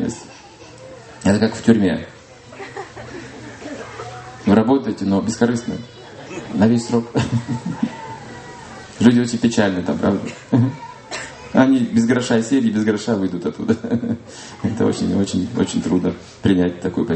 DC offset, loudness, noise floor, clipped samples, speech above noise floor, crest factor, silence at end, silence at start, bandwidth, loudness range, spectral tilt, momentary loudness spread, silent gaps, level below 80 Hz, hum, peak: under 0.1%; -19 LUFS; -41 dBFS; under 0.1%; 23 dB; 20 dB; 0 s; 0 s; 8.8 kHz; 4 LU; -6.5 dB/octave; 19 LU; none; -50 dBFS; none; 0 dBFS